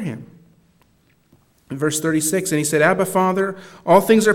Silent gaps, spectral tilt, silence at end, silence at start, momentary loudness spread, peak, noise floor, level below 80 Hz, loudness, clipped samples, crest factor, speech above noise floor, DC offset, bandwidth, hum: none; -4.5 dB/octave; 0 s; 0 s; 16 LU; 0 dBFS; -59 dBFS; -62 dBFS; -18 LUFS; under 0.1%; 20 dB; 42 dB; under 0.1%; 17.5 kHz; none